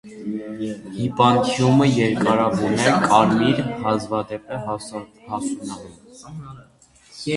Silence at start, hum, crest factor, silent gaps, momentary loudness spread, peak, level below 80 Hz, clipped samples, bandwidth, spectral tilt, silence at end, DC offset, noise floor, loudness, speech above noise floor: 0.05 s; none; 20 dB; none; 19 LU; 0 dBFS; -54 dBFS; under 0.1%; 11.5 kHz; -5.5 dB/octave; 0 s; under 0.1%; -51 dBFS; -20 LUFS; 30 dB